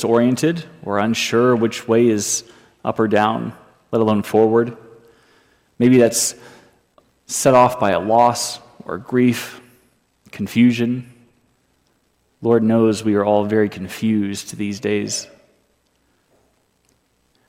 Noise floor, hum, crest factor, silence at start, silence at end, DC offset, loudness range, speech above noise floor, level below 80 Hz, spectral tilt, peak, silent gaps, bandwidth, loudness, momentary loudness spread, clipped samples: -63 dBFS; none; 16 dB; 0 s; 2.25 s; under 0.1%; 5 LU; 46 dB; -62 dBFS; -5 dB/octave; -2 dBFS; none; 16.5 kHz; -18 LUFS; 12 LU; under 0.1%